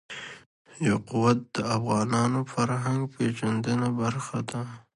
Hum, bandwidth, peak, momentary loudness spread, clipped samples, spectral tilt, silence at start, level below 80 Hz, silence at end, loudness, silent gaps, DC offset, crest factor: none; 11.5 kHz; -8 dBFS; 9 LU; under 0.1%; -6 dB/octave; 0.1 s; -60 dBFS; 0.15 s; -27 LUFS; 0.46-0.65 s; under 0.1%; 20 dB